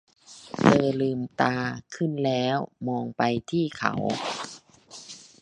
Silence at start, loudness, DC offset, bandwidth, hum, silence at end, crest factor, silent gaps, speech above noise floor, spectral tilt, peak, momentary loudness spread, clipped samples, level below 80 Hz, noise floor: 0.3 s; -26 LUFS; under 0.1%; 10.5 kHz; none; 0.2 s; 24 dB; none; 22 dB; -6 dB/octave; -2 dBFS; 20 LU; under 0.1%; -62 dBFS; -48 dBFS